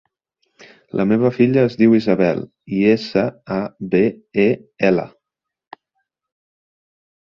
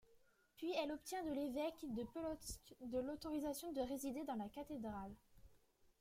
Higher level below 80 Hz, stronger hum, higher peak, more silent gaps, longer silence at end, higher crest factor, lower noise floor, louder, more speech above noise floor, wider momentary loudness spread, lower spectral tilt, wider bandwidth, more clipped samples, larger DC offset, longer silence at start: first, -56 dBFS vs -68 dBFS; neither; first, -2 dBFS vs -30 dBFS; neither; first, 2.2 s vs 0.45 s; about the same, 18 dB vs 16 dB; first, -82 dBFS vs -73 dBFS; first, -18 LUFS vs -46 LUFS; first, 65 dB vs 28 dB; first, 10 LU vs 7 LU; first, -8.5 dB/octave vs -4.5 dB/octave; second, 6.8 kHz vs 16.5 kHz; neither; neither; first, 0.95 s vs 0.1 s